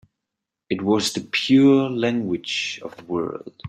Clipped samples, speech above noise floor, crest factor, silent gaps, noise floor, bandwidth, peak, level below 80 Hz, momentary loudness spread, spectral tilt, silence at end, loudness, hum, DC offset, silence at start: under 0.1%; 63 dB; 16 dB; none; -84 dBFS; 13 kHz; -6 dBFS; -64 dBFS; 14 LU; -5 dB/octave; 0 s; -21 LUFS; none; under 0.1%; 0.7 s